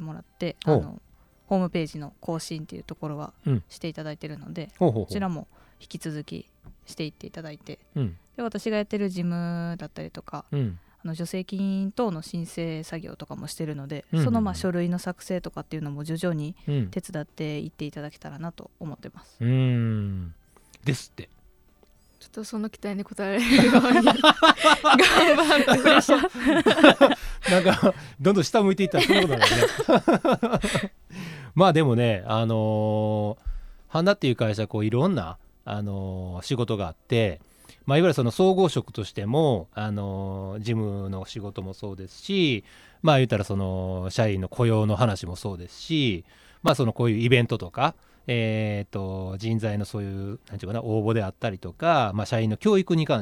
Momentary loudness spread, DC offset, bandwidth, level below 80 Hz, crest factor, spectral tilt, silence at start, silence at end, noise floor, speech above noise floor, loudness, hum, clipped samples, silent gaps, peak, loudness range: 20 LU; under 0.1%; 18 kHz; -50 dBFS; 24 dB; -5.5 dB/octave; 0 s; 0 s; -58 dBFS; 34 dB; -23 LUFS; none; under 0.1%; none; 0 dBFS; 13 LU